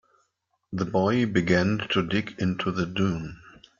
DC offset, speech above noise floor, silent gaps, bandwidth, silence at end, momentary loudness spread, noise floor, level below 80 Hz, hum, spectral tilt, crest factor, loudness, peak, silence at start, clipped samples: under 0.1%; 50 dB; none; 7.4 kHz; 0.4 s; 10 LU; -75 dBFS; -56 dBFS; none; -6.5 dB/octave; 20 dB; -25 LUFS; -6 dBFS; 0.7 s; under 0.1%